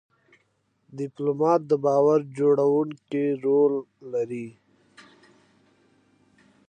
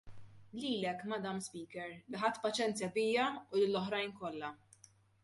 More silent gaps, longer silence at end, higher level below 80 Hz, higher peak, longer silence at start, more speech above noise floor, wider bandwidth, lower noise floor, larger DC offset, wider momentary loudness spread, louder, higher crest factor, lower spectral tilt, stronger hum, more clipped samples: neither; first, 2.2 s vs 0.7 s; second, -80 dBFS vs -74 dBFS; first, -8 dBFS vs -20 dBFS; first, 0.95 s vs 0.05 s; first, 47 dB vs 28 dB; second, 9 kHz vs 11.5 kHz; first, -70 dBFS vs -65 dBFS; neither; first, 15 LU vs 12 LU; first, -24 LUFS vs -37 LUFS; about the same, 18 dB vs 18 dB; first, -8.5 dB/octave vs -4 dB/octave; neither; neither